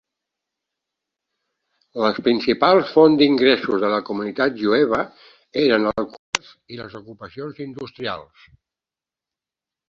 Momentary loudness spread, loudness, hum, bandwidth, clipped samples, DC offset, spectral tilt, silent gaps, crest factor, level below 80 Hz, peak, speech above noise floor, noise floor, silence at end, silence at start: 20 LU; -19 LUFS; none; 8.2 kHz; under 0.1%; under 0.1%; -5 dB/octave; 6.19-6.33 s; 22 dB; -60 dBFS; 0 dBFS; 70 dB; -90 dBFS; 1.65 s; 1.95 s